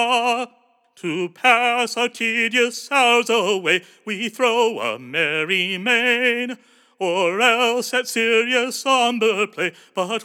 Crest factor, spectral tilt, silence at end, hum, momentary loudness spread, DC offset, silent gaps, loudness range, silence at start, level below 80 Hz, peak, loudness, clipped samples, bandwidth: 20 dB; -2.5 dB/octave; 0 s; none; 10 LU; under 0.1%; none; 1 LU; 0 s; under -90 dBFS; -2 dBFS; -19 LUFS; under 0.1%; 17.5 kHz